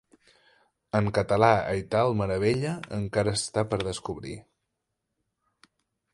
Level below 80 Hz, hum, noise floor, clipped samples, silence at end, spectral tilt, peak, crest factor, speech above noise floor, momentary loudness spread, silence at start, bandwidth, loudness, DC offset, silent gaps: -52 dBFS; none; -82 dBFS; under 0.1%; 1.7 s; -5.5 dB/octave; -6 dBFS; 24 dB; 56 dB; 13 LU; 0.95 s; 11.5 kHz; -26 LUFS; under 0.1%; none